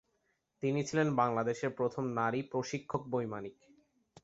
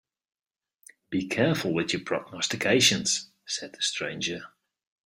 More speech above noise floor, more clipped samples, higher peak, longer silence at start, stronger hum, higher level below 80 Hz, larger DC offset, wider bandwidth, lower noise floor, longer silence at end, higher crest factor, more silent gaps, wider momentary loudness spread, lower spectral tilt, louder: first, 45 dB vs 30 dB; neither; second, -16 dBFS vs -8 dBFS; second, 0.6 s vs 1.1 s; neither; about the same, -70 dBFS vs -66 dBFS; neither; second, 8 kHz vs 16 kHz; first, -79 dBFS vs -57 dBFS; about the same, 0.7 s vs 0.6 s; about the same, 20 dB vs 22 dB; neither; second, 8 LU vs 13 LU; first, -6 dB/octave vs -3 dB/octave; second, -34 LUFS vs -26 LUFS